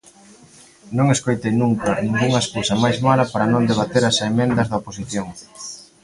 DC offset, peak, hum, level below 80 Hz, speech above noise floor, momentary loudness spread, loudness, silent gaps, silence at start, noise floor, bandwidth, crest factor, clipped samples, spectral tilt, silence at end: under 0.1%; -2 dBFS; none; -48 dBFS; 29 dB; 10 LU; -19 LUFS; none; 0.85 s; -47 dBFS; 11.5 kHz; 18 dB; under 0.1%; -5 dB/octave; 0.2 s